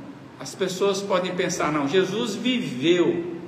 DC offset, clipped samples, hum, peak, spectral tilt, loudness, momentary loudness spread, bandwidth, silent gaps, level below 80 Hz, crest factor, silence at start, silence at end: under 0.1%; under 0.1%; none; -8 dBFS; -4.5 dB/octave; -23 LUFS; 8 LU; 15 kHz; none; -66 dBFS; 16 dB; 0 s; 0 s